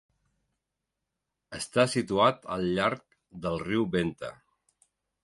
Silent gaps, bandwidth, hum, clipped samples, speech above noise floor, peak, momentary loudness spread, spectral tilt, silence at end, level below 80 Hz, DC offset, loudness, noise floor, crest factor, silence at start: none; 11.5 kHz; none; under 0.1%; 57 dB; -10 dBFS; 16 LU; -5 dB/octave; 0.9 s; -58 dBFS; under 0.1%; -28 LUFS; -85 dBFS; 20 dB; 1.5 s